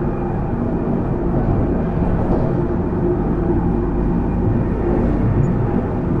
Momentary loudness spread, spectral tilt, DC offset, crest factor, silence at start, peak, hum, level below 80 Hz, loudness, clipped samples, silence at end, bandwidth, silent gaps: 3 LU; -11 dB/octave; under 0.1%; 12 dB; 0 s; -4 dBFS; none; -24 dBFS; -19 LUFS; under 0.1%; 0 s; 4.3 kHz; none